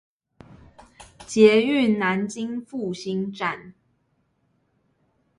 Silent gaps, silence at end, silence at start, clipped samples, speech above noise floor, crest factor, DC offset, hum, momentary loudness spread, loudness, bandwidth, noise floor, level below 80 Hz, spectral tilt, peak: none; 1.7 s; 1 s; under 0.1%; 48 dB; 22 dB; under 0.1%; none; 15 LU; -22 LUFS; 11.5 kHz; -69 dBFS; -62 dBFS; -5.5 dB/octave; -2 dBFS